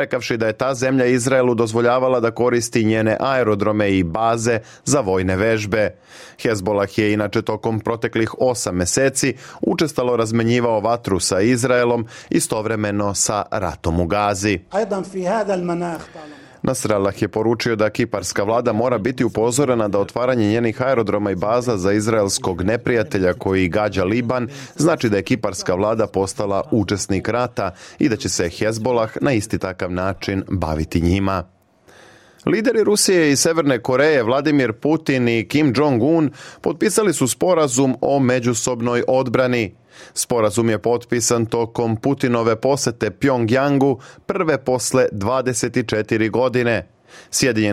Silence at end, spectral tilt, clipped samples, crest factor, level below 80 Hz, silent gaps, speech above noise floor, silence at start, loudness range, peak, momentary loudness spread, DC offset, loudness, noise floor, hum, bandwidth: 0 s; -5 dB/octave; under 0.1%; 14 dB; -48 dBFS; none; 31 dB; 0 s; 4 LU; -4 dBFS; 6 LU; under 0.1%; -19 LUFS; -49 dBFS; none; 16 kHz